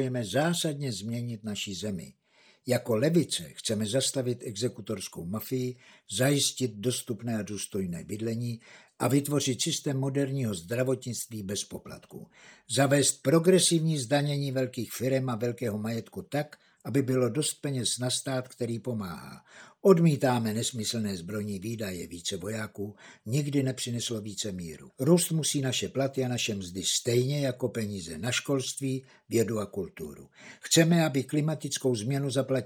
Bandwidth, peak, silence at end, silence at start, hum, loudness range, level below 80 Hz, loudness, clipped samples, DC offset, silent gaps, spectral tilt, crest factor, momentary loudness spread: over 20 kHz; -6 dBFS; 0 s; 0 s; none; 5 LU; -72 dBFS; -29 LUFS; under 0.1%; under 0.1%; none; -4.5 dB/octave; 22 dB; 13 LU